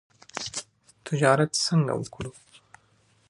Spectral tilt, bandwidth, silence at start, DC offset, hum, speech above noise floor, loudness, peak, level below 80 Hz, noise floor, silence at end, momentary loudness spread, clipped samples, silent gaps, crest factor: -4.5 dB/octave; 11.5 kHz; 0.35 s; under 0.1%; none; 40 dB; -26 LUFS; -4 dBFS; -60 dBFS; -64 dBFS; 1 s; 18 LU; under 0.1%; none; 24 dB